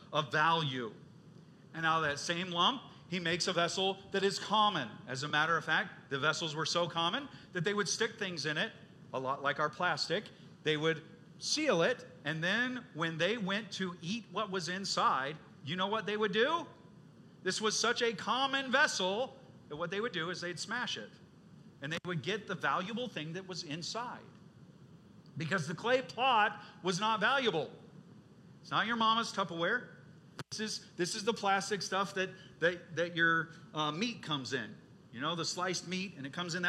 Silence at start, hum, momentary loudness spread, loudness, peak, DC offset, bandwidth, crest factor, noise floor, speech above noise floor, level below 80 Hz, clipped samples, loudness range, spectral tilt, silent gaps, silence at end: 0 s; none; 11 LU; -34 LUFS; -14 dBFS; under 0.1%; 13.5 kHz; 22 dB; -57 dBFS; 23 dB; -78 dBFS; under 0.1%; 6 LU; -3.5 dB/octave; none; 0 s